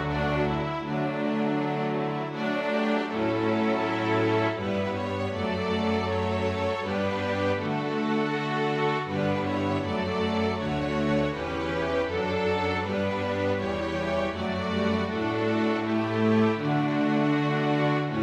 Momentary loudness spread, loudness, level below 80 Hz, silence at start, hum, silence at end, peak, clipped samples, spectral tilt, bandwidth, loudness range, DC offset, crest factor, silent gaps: 4 LU; -27 LUFS; -50 dBFS; 0 s; none; 0 s; -12 dBFS; under 0.1%; -7 dB/octave; 10 kHz; 2 LU; under 0.1%; 14 dB; none